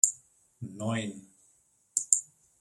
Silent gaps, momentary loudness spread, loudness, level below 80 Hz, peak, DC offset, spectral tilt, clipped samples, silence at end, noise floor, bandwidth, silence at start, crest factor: none; 21 LU; -29 LUFS; -74 dBFS; -2 dBFS; under 0.1%; -2.5 dB/octave; under 0.1%; 0.35 s; -68 dBFS; 16 kHz; 0.05 s; 32 dB